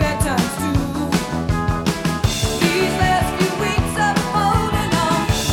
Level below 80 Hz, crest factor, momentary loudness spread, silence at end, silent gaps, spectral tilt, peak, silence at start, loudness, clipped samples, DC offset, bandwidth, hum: -30 dBFS; 18 dB; 3 LU; 0 s; none; -5 dB/octave; 0 dBFS; 0 s; -19 LUFS; under 0.1%; under 0.1%; 18.5 kHz; none